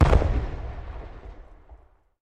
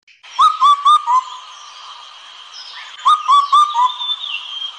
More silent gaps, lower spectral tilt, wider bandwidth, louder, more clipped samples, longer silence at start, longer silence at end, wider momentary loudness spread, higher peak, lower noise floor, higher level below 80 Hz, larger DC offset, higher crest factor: neither; first, -8 dB/octave vs 2.5 dB/octave; second, 8.8 kHz vs 9.8 kHz; second, -27 LUFS vs -13 LUFS; neither; second, 0 s vs 0.25 s; first, 0.5 s vs 0 s; about the same, 24 LU vs 23 LU; about the same, -4 dBFS vs -4 dBFS; first, -52 dBFS vs -38 dBFS; first, -28 dBFS vs -64 dBFS; first, 0.2% vs under 0.1%; first, 22 dB vs 12 dB